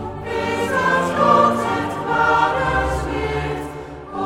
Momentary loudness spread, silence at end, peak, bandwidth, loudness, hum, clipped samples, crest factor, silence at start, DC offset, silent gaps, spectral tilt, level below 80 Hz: 12 LU; 0 s; -2 dBFS; 16.5 kHz; -19 LUFS; none; under 0.1%; 18 dB; 0 s; under 0.1%; none; -5.5 dB/octave; -36 dBFS